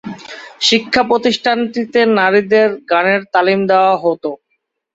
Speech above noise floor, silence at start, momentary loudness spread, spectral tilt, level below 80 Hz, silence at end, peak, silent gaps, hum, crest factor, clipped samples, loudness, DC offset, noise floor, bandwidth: 55 dB; 0.05 s; 13 LU; -4 dB/octave; -56 dBFS; 0.6 s; 0 dBFS; none; none; 14 dB; under 0.1%; -13 LUFS; under 0.1%; -68 dBFS; 8 kHz